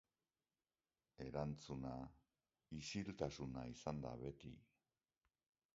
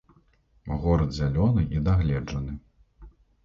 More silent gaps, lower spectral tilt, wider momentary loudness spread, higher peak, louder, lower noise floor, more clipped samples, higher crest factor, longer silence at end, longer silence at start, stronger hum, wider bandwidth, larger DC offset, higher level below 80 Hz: neither; second, -6 dB/octave vs -8.5 dB/octave; about the same, 11 LU vs 13 LU; second, -28 dBFS vs -10 dBFS; second, -50 LUFS vs -26 LUFS; first, under -90 dBFS vs -62 dBFS; neither; first, 24 dB vs 16 dB; first, 1.1 s vs 0.35 s; first, 1.2 s vs 0.65 s; neither; about the same, 7.6 kHz vs 7.2 kHz; neither; second, -68 dBFS vs -34 dBFS